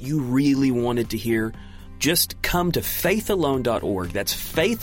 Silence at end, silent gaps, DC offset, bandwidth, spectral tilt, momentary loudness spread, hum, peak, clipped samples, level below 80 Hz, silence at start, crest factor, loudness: 0 s; none; under 0.1%; 17 kHz; -4.5 dB/octave; 5 LU; none; -6 dBFS; under 0.1%; -40 dBFS; 0 s; 16 dB; -22 LUFS